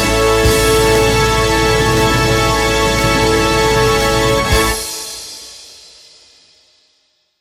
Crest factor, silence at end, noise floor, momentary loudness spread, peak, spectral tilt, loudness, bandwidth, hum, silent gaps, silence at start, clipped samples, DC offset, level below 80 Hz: 12 dB; 1.65 s; -60 dBFS; 13 LU; -2 dBFS; -4 dB/octave; -12 LUFS; 17.5 kHz; none; none; 0 s; under 0.1%; under 0.1%; -24 dBFS